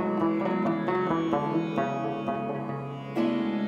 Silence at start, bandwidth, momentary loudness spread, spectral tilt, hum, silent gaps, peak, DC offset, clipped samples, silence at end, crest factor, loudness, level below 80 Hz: 0 s; 7.2 kHz; 7 LU; -8 dB/octave; none; none; -14 dBFS; under 0.1%; under 0.1%; 0 s; 14 dB; -28 LUFS; -64 dBFS